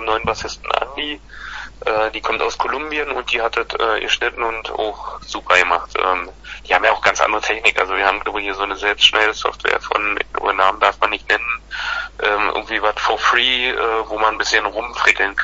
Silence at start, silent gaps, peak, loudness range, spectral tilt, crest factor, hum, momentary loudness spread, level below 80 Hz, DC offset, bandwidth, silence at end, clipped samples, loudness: 0 s; none; 0 dBFS; 4 LU; -1.5 dB/octave; 18 dB; none; 10 LU; -42 dBFS; under 0.1%; 10.5 kHz; 0 s; under 0.1%; -17 LUFS